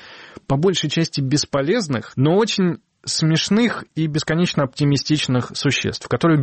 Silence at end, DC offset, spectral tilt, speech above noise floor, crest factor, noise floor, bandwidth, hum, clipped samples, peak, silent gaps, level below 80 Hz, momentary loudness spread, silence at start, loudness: 0 s; under 0.1%; -5 dB/octave; 20 dB; 12 dB; -38 dBFS; 8.8 kHz; none; under 0.1%; -8 dBFS; none; -50 dBFS; 7 LU; 0 s; -19 LUFS